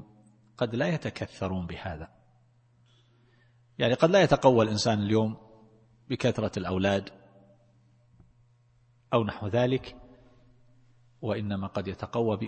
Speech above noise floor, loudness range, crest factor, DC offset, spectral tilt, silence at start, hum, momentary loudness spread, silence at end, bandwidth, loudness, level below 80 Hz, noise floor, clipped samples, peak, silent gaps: 37 dB; 9 LU; 24 dB; under 0.1%; -6 dB/octave; 0 s; none; 17 LU; 0 s; 8.8 kHz; -28 LUFS; -56 dBFS; -64 dBFS; under 0.1%; -6 dBFS; none